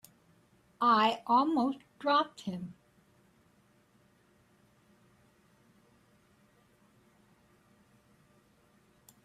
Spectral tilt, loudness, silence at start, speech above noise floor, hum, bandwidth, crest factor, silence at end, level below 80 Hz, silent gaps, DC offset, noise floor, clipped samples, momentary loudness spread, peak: -5.5 dB/octave; -30 LUFS; 0.8 s; 38 dB; none; 14.5 kHz; 20 dB; 6.5 s; -78 dBFS; none; under 0.1%; -67 dBFS; under 0.1%; 15 LU; -16 dBFS